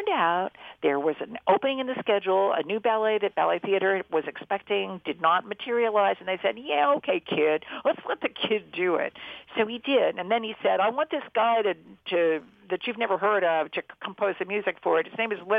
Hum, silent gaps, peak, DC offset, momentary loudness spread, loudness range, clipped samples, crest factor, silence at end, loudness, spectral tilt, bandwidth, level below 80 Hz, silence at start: none; none; -8 dBFS; under 0.1%; 7 LU; 2 LU; under 0.1%; 18 dB; 0 s; -26 LUFS; -7 dB/octave; 4.9 kHz; -72 dBFS; 0 s